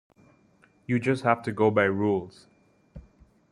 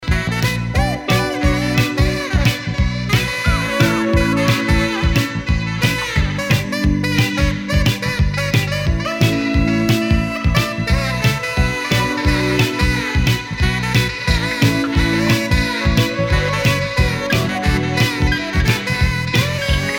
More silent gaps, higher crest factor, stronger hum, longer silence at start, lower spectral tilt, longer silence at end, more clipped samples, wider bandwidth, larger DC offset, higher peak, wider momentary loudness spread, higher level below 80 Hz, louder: neither; first, 22 dB vs 14 dB; neither; first, 0.9 s vs 0 s; first, -7.5 dB/octave vs -5 dB/octave; first, 0.5 s vs 0 s; neither; second, 11 kHz vs 18 kHz; neither; about the same, -6 dBFS vs -4 dBFS; first, 13 LU vs 3 LU; second, -60 dBFS vs -24 dBFS; second, -25 LUFS vs -17 LUFS